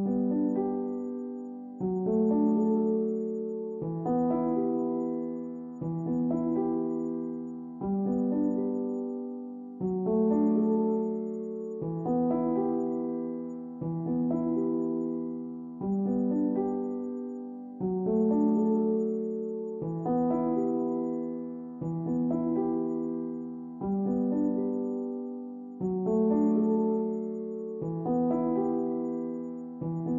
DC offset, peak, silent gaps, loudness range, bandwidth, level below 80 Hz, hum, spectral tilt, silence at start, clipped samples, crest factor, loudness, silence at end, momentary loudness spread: under 0.1%; -16 dBFS; none; 3 LU; 2.1 kHz; -64 dBFS; none; -12.5 dB/octave; 0 s; under 0.1%; 14 dB; -30 LUFS; 0 s; 11 LU